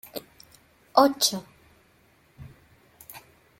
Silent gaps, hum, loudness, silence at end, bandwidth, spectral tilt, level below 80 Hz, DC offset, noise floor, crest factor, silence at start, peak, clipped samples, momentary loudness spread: none; none; -23 LUFS; 0.4 s; 16.5 kHz; -2.5 dB/octave; -66 dBFS; under 0.1%; -61 dBFS; 26 dB; 0.15 s; -4 dBFS; under 0.1%; 25 LU